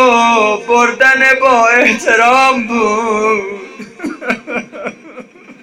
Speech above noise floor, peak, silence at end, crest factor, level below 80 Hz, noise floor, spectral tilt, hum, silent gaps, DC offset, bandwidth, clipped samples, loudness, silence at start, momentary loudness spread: 24 dB; 0 dBFS; 0.1 s; 12 dB; -52 dBFS; -34 dBFS; -3 dB/octave; none; none; under 0.1%; 15.5 kHz; under 0.1%; -10 LUFS; 0 s; 17 LU